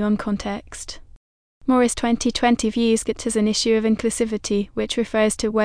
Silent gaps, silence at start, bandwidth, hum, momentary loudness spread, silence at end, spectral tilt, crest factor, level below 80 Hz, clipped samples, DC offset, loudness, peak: 1.16-1.61 s; 0 s; 10.5 kHz; none; 11 LU; 0 s; -4 dB/octave; 16 dB; -44 dBFS; under 0.1%; under 0.1%; -21 LUFS; -4 dBFS